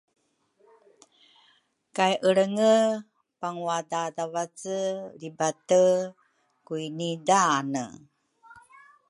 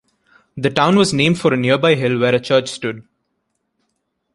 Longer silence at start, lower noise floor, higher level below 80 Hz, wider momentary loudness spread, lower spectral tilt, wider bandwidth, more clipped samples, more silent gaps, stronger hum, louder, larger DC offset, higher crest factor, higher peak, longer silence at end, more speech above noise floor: first, 1.95 s vs 0.55 s; second, -67 dBFS vs -71 dBFS; second, -78 dBFS vs -54 dBFS; first, 15 LU vs 12 LU; second, -4 dB/octave vs -5.5 dB/octave; about the same, 11.5 kHz vs 11.5 kHz; neither; neither; neither; second, -26 LUFS vs -16 LUFS; neither; about the same, 20 dB vs 18 dB; second, -8 dBFS vs 0 dBFS; second, 0.5 s vs 1.35 s; second, 41 dB vs 56 dB